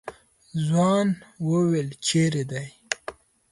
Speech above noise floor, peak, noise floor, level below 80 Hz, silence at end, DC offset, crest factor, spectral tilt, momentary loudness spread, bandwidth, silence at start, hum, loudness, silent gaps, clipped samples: 20 dB; -4 dBFS; -43 dBFS; -62 dBFS; 0.4 s; under 0.1%; 20 dB; -5.5 dB/octave; 13 LU; 11.5 kHz; 0.05 s; none; -25 LUFS; none; under 0.1%